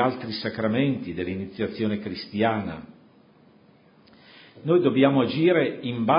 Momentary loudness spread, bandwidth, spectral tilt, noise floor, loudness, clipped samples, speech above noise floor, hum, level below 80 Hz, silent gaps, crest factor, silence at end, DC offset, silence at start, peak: 11 LU; 5.4 kHz; -11 dB/octave; -56 dBFS; -24 LUFS; under 0.1%; 32 dB; none; -56 dBFS; none; 20 dB; 0 s; under 0.1%; 0 s; -4 dBFS